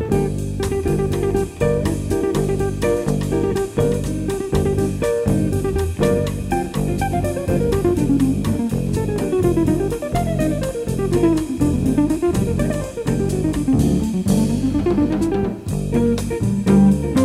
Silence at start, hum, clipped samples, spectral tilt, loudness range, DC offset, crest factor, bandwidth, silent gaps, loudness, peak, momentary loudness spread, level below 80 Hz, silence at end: 0 s; none; under 0.1%; -7 dB/octave; 1 LU; under 0.1%; 16 dB; 16 kHz; none; -19 LUFS; -2 dBFS; 5 LU; -30 dBFS; 0 s